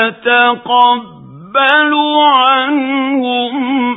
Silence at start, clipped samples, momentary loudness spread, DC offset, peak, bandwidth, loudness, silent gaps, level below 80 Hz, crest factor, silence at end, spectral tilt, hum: 0 s; under 0.1%; 7 LU; under 0.1%; 0 dBFS; 4 kHz; -11 LUFS; none; -64 dBFS; 12 dB; 0 s; -6 dB/octave; none